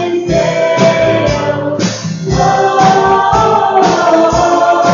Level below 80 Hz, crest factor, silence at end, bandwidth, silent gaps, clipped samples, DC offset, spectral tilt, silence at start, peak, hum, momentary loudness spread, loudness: -32 dBFS; 10 dB; 0 s; 7.6 kHz; none; under 0.1%; under 0.1%; -5 dB/octave; 0 s; 0 dBFS; none; 6 LU; -10 LUFS